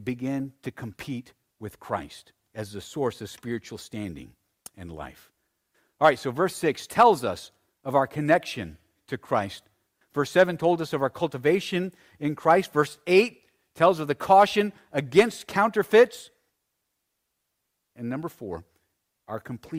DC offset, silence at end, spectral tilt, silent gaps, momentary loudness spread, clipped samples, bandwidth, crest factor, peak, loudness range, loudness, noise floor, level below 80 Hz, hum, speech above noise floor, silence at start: under 0.1%; 0 s; -5.5 dB/octave; none; 20 LU; under 0.1%; 16 kHz; 20 dB; -6 dBFS; 14 LU; -24 LUFS; -79 dBFS; -62 dBFS; none; 54 dB; 0 s